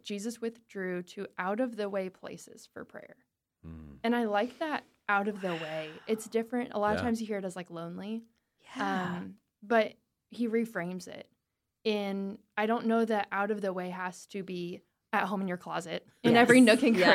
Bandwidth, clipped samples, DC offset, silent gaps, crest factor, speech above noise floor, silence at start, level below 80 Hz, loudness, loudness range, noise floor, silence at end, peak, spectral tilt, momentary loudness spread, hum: 15.5 kHz; under 0.1%; under 0.1%; none; 24 dB; 54 dB; 0.05 s; -70 dBFS; -31 LUFS; 4 LU; -84 dBFS; 0 s; -6 dBFS; -5 dB/octave; 18 LU; none